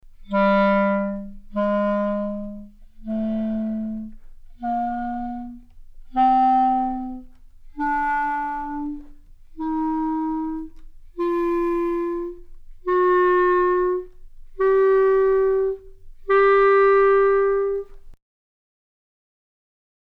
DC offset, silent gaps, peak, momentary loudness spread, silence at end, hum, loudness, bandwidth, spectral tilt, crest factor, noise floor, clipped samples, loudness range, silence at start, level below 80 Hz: under 0.1%; none; -8 dBFS; 17 LU; 2.05 s; none; -21 LUFS; 5 kHz; -8.5 dB/octave; 14 dB; -43 dBFS; under 0.1%; 9 LU; 0.2 s; -44 dBFS